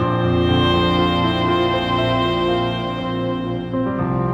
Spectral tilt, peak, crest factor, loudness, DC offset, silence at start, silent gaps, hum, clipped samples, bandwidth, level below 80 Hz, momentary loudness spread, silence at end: -7.5 dB/octave; -6 dBFS; 12 dB; -19 LUFS; under 0.1%; 0 s; none; none; under 0.1%; 8.2 kHz; -38 dBFS; 7 LU; 0 s